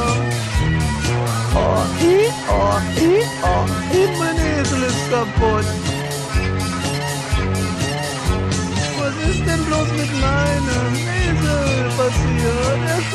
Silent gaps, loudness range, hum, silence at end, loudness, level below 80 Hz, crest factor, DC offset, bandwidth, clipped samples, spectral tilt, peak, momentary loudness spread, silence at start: none; 3 LU; none; 0 s; -18 LUFS; -26 dBFS; 14 dB; under 0.1%; 14 kHz; under 0.1%; -5 dB/octave; -4 dBFS; 5 LU; 0 s